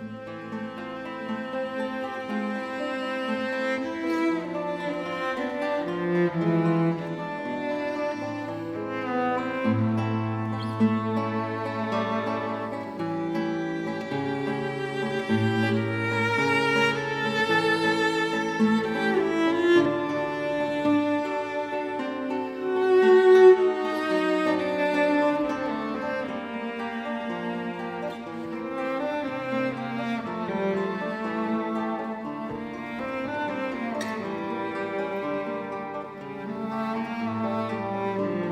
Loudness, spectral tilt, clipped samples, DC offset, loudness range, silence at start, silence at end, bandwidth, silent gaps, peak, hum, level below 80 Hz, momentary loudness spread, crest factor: -26 LUFS; -6.5 dB/octave; under 0.1%; under 0.1%; 10 LU; 0 s; 0 s; 12 kHz; none; -6 dBFS; none; -66 dBFS; 10 LU; 20 dB